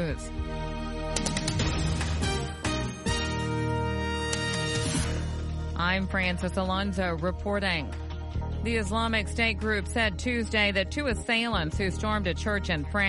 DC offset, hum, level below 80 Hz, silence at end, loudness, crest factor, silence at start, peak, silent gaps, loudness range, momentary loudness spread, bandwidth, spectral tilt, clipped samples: under 0.1%; none; -36 dBFS; 0 s; -29 LUFS; 20 dB; 0 s; -10 dBFS; none; 3 LU; 8 LU; 11.5 kHz; -4.5 dB/octave; under 0.1%